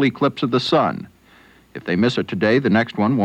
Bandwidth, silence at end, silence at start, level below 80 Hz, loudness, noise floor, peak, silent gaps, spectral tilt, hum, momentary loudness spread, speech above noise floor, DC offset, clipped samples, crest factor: 9.4 kHz; 0 s; 0 s; -58 dBFS; -19 LUFS; -50 dBFS; -6 dBFS; none; -7 dB/octave; none; 12 LU; 32 dB; under 0.1%; under 0.1%; 14 dB